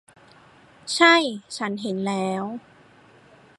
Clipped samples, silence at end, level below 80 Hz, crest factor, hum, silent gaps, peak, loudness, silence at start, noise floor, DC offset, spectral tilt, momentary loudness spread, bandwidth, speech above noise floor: under 0.1%; 1 s; -72 dBFS; 22 dB; none; none; -2 dBFS; -21 LUFS; 0.85 s; -53 dBFS; under 0.1%; -3.5 dB/octave; 18 LU; 11.5 kHz; 31 dB